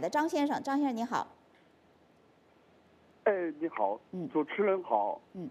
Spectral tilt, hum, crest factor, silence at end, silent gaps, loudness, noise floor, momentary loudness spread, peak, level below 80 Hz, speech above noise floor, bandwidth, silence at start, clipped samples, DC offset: -5.5 dB/octave; none; 20 dB; 0 s; none; -32 LUFS; -64 dBFS; 6 LU; -14 dBFS; -82 dBFS; 32 dB; 14 kHz; 0 s; under 0.1%; under 0.1%